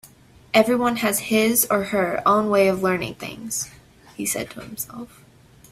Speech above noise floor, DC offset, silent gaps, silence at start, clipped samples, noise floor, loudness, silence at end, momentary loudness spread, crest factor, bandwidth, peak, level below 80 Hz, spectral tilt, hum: 28 dB; under 0.1%; none; 0.05 s; under 0.1%; -50 dBFS; -21 LUFS; 0.65 s; 15 LU; 20 dB; 16 kHz; -4 dBFS; -56 dBFS; -3.5 dB/octave; none